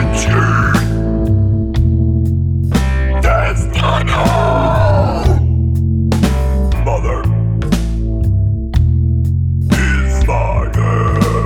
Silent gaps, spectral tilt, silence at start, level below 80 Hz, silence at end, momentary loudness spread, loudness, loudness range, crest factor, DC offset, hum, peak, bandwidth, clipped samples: none; -6.5 dB/octave; 0 s; -18 dBFS; 0 s; 3 LU; -14 LUFS; 2 LU; 12 dB; under 0.1%; none; 0 dBFS; 15 kHz; under 0.1%